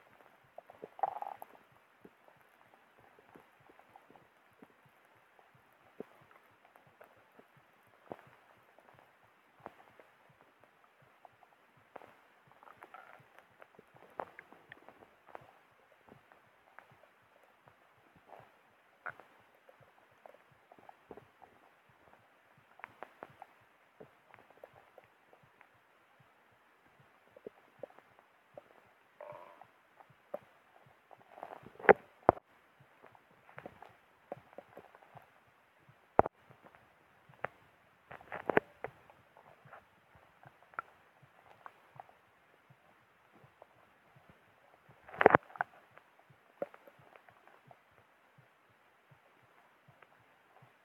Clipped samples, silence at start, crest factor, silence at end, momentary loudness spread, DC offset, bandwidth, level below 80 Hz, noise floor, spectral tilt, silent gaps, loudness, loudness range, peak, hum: under 0.1%; 1.05 s; 42 dB; 4.2 s; 30 LU; under 0.1%; 14.5 kHz; -74 dBFS; -68 dBFS; -7 dB/octave; none; -36 LUFS; 27 LU; -2 dBFS; none